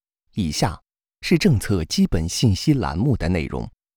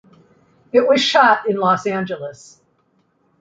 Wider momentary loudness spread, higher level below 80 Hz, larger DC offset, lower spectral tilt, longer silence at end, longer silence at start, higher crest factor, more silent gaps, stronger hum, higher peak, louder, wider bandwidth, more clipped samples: second, 12 LU vs 15 LU; first, -36 dBFS vs -66 dBFS; neither; first, -5.5 dB/octave vs -4 dB/octave; second, 0.3 s vs 1.1 s; second, 0.35 s vs 0.75 s; about the same, 16 dB vs 18 dB; neither; neither; about the same, -4 dBFS vs -2 dBFS; second, -21 LUFS vs -16 LUFS; first, over 20 kHz vs 9.2 kHz; neither